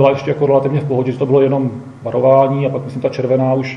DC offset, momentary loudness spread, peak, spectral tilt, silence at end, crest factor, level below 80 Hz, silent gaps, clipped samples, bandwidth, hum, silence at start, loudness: under 0.1%; 9 LU; 0 dBFS; -9 dB/octave; 0 s; 14 dB; -56 dBFS; none; under 0.1%; 7 kHz; none; 0 s; -15 LUFS